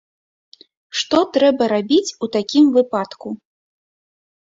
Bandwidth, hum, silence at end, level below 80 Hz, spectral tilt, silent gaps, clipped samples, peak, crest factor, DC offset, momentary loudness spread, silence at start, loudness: 7.8 kHz; none; 1.25 s; -62 dBFS; -4 dB/octave; none; under 0.1%; -2 dBFS; 18 dB; under 0.1%; 15 LU; 0.95 s; -17 LUFS